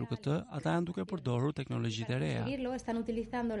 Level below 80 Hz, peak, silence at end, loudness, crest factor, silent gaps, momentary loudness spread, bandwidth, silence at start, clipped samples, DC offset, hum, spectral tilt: -58 dBFS; -20 dBFS; 0 s; -35 LUFS; 14 dB; none; 3 LU; 11 kHz; 0 s; under 0.1%; under 0.1%; none; -7 dB/octave